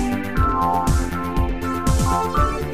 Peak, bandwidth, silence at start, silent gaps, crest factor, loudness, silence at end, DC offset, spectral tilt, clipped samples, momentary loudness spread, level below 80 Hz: -8 dBFS; 16 kHz; 0 s; none; 12 dB; -21 LUFS; 0 s; 2%; -6 dB/octave; under 0.1%; 4 LU; -24 dBFS